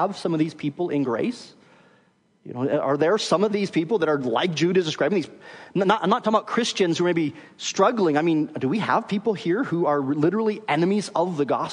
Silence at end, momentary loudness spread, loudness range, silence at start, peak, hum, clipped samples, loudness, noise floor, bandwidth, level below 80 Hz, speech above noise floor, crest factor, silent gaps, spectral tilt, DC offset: 0 s; 7 LU; 3 LU; 0 s; -6 dBFS; none; under 0.1%; -23 LUFS; -62 dBFS; 10.5 kHz; -72 dBFS; 39 dB; 18 dB; none; -5.5 dB/octave; under 0.1%